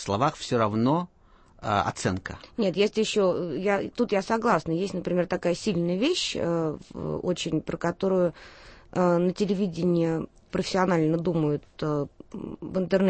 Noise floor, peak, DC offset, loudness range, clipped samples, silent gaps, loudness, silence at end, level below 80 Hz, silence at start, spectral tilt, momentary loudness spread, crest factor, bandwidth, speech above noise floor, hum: -55 dBFS; -10 dBFS; under 0.1%; 2 LU; under 0.1%; none; -26 LUFS; 0 s; -54 dBFS; 0 s; -6 dB/octave; 9 LU; 16 dB; 8.8 kHz; 29 dB; none